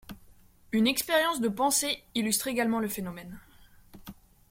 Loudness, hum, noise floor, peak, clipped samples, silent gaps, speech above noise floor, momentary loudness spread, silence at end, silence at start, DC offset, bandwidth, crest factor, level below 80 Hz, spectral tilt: -28 LUFS; none; -56 dBFS; -10 dBFS; under 0.1%; none; 28 dB; 22 LU; 0.4 s; 0.1 s; under 0.1%; 16.5 kHz; 20 dB; -60 dBFS; -2.5 dB/octave